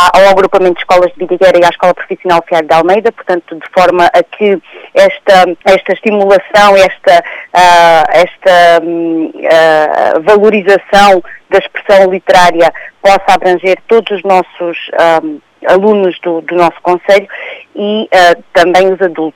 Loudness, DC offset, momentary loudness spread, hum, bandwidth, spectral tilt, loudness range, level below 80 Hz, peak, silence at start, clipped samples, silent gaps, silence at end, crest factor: -8 LUFS; under 0.1%; 9 LU; none; 16.5 kHz; -4.5 dB/octave; 4 LU; -42 dBFS; 0 dBFS; 0 s; 0.7%; none; 0.05 s; 8 dB